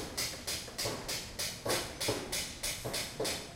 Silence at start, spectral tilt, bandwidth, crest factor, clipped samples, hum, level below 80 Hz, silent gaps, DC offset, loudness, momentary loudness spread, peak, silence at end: 0 s; -2 dB/octave; 16.5 kHz; 20 dB; under 0.1%; none; -54 dBFS; none; under 0.1%; -36 LUFS; 4 LU; -18 dBFS; 0 s